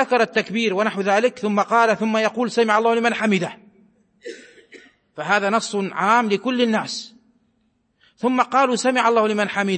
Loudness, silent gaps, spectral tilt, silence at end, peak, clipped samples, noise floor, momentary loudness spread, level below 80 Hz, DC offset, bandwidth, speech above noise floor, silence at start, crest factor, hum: -19 LUFS; none; -4.5 dB/octave; 0 s; -4 dBFS; under 0.1%; -66 dBFS; 12 LU; -72 dBFS; under 0.1%; 8.8 kHz; 47 dB; 0 s; 16 dB; none